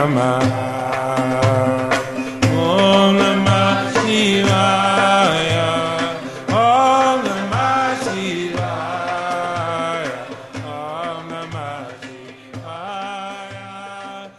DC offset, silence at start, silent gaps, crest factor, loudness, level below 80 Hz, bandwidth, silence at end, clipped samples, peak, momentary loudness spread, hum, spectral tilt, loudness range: under 0.1%; 0 s; none; 16 dB; -17 LUFS; -52 dBFS; 12.5 kHz; 0.05 s; under 0.1%; -2 dBFS; 18 LU; none; -5 dB/octave; 14 LU